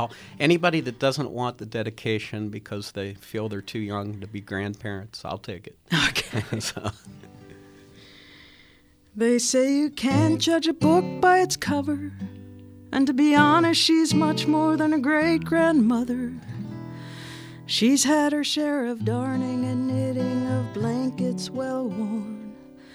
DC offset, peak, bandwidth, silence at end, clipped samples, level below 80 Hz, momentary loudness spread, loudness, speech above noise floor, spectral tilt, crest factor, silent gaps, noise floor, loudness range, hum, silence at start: under 0.1%; -4 dBFS; 15 kHz; 0.3 s; under 0.1%; -58 dBFS; 17 LU; -23 LUFS; 33 dB; -4.5 dB/octave; 20 dB; none; -56 dBFS; 10 LU; none; 0 s